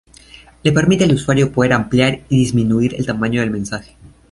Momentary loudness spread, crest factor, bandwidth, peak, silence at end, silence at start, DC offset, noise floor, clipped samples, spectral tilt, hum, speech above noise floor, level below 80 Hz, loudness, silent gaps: 7 LU; 14 dB; 11.5 kHz; -2 dBFS; 0.25 s; 0.65 s; under 0.1%; -43 dBFS; under 0.1%; -6 dB/octave; none; 28 dB; -42 dBFS; -16 LUFS; none